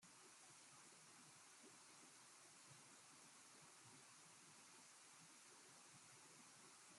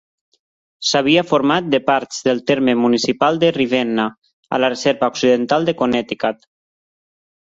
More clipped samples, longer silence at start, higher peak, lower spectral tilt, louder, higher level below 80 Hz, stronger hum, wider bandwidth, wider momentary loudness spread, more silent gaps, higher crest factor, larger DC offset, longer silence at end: neither; second, 0 s vs 0.8 s; second, -54 dBFS vs -2 dBFS; second, -1 dB/octave vs -4.5 dB/octave; second, -64 LUFS vs -17 LUFS; second, under -90 dBFS vs -58 dBFS; neither; first, 13.5 kHz vs 7.8 kHz; second, 0 LU vs 8 LU; second, none vs 4.18-4.22 s, 4.33-4.43 s; about the same, 14 dB vs 16 dB; neither; second, 0 s vs 1.2 s